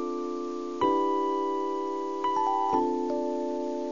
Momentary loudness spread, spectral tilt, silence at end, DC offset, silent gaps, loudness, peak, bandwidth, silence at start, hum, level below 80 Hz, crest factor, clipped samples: 7 LU; -5.5 dB/octave; 0 s; 0.4%; none; -29 LUFS; -12 dBFS; 7.4 kHz; 0 s; none; -66 dBFS; 16 dB; under 0.1%